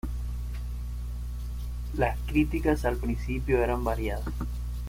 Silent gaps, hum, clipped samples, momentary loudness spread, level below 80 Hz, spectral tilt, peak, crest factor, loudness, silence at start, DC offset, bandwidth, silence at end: none; 60 Hz at -30 dBFS; under 0.1%; 10 LU; -32 dBFS; -7.5 dB/octave; -12 dBFS; 18 dB; -30 LUFS; 0.05 s; under 0.1%; 16 kHz; 0 s